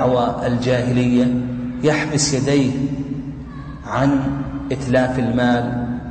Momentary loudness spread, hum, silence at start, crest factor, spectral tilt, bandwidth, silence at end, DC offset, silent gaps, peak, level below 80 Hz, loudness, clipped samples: 9 LU; none; 0 s; 12 dB; -5.5 dB/octave; 9.2 kHz; 0 s; under 0.1%; none; -6 dBFS; -38 dBFS; -19 LUFS; under 0.1%